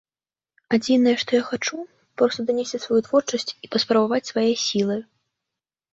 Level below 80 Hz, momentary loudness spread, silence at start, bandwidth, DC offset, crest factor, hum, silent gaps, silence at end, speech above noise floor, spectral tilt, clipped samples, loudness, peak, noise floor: -66 dBFS; 9 LU; 0.7 s; 8 kHz; under 0.1%; 18 dB; none; none; 0.9 s; over 69 dB; -4 dB/octave; under 0.1%; -22 LUFS; -6 dBFS; under -90 dBFS